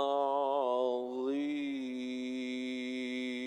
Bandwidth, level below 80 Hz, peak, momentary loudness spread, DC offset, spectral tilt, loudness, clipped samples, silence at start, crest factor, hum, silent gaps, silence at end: 11 kHz; -80 dBFS; -18 dBFS; 7 LU; under 0.1%; -4 dB/octave; -35 LUFS; under 0.1%; 0 s; 16 dB; none; none; 0 s